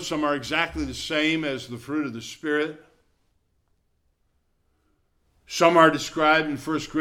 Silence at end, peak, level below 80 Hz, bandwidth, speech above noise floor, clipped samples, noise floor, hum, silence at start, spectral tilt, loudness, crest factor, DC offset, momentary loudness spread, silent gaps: 0 s; -4 dBFS; -52 dBFS; 15.5 kHz; 46 dB; under 0.1%; -69 dBFS; none; 0 s; -4 dB/octave; -23 LUFS; 22 dB; under 0.1%; 14 LU; none